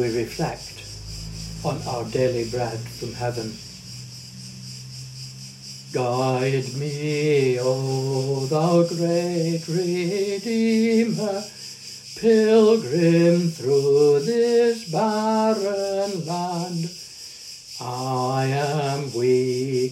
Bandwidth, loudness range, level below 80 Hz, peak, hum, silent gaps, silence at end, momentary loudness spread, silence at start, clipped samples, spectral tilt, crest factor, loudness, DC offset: 15 kHz; 10 LU; -52 dBFS; -6 dBFS; none; none; 0 s; 18 LU; 0 s; under 0.1%; -6 dB/octave; 16 dB; -22 LUFS; under 0.1%